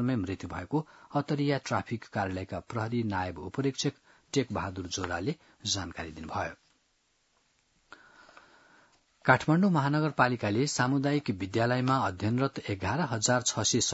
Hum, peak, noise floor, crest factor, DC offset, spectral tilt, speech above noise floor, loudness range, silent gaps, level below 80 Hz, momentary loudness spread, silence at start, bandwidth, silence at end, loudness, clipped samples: none; -6 dBFS; -72 dBFS; 24 dB; under 0.1%; -4.5 dB/octave; 43 dB; 10 LU; none; -64 dBFS; 10 LU; 0 s; 8 kHz; 0 s; -30 LUFS; under 0.1%